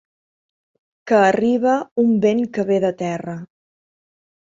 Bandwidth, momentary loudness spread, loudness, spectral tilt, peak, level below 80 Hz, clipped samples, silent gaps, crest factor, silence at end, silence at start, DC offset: 7.6 kHz; 11 LU; -18 LUFS; -6.5 dB/octave; -2 dBFS; -64 dBFS; under 0.1%; 1.91-1.96 s; 18 dB; 1.15 s; 1.05 s; under 0.1%